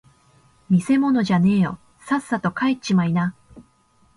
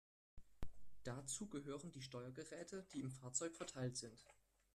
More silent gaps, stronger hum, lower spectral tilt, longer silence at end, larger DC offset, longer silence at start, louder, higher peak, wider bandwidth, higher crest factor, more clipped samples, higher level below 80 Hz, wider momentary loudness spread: neither; neither; first, -7 dB/octave vs -4 dB/octave; first, 0.55 s vs 0.4 s; neither; first, 0.7 s vs 0.35 s; first, -21 LUFS vs -50 LUFS; first, -8 dBFS vs -28 dBFS; second, 11.5 kHz vs 13.5 kHz; second, 14 dB vs 22 dB; neither; first, -56 dBFS vs -66 dBFS; second, 7 LU vs 15 LU